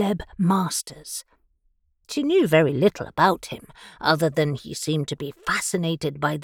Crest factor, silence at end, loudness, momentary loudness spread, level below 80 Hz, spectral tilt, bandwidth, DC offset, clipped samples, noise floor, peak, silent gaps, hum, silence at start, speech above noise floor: 20 dB; 0 s; -23 LUFS; 14 LU; -54 dBFS; -5 dB/octave; 18 kHz; under 0.1%; under 0.1%; -67 dBFS; -4 dBFS; none; none; 0 s; 44 dB